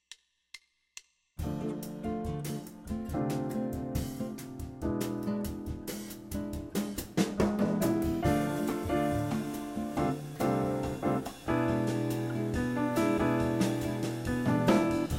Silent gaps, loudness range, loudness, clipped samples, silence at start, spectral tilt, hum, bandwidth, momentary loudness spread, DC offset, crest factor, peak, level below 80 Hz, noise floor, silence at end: none; 6 LU; -32 LUFS; under 0.1%; 0.1 s; -6.5 dB/octave; none; 16 kHz; 11 LU; under 0.1%; 20 dB; -12 dBFS; -48 dBFS; -57 dBFS; 0 s